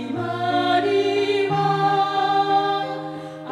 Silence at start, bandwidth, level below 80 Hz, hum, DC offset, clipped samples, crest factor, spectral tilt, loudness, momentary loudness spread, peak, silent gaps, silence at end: 0 s; 11 kHz; -68 dBFS; none; under 0.1%; under 0.1%; 12 dB; -6 dB/octave; -21 LUFS; 9 LU; -8 dBFS; none; 0 s